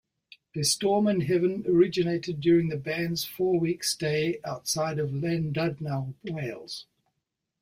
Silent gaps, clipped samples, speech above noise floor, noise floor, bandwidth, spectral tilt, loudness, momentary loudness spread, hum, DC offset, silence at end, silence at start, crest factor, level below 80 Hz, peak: none; under 0.1%; 56 dB; -83 dBFS; 16 kHz; -5 dB/octave; -27 LUFS; 11 LU; none; under 0.1%; 0.8 s; 0.55 s; 18 dB; -62 dBFS; -10 dBFS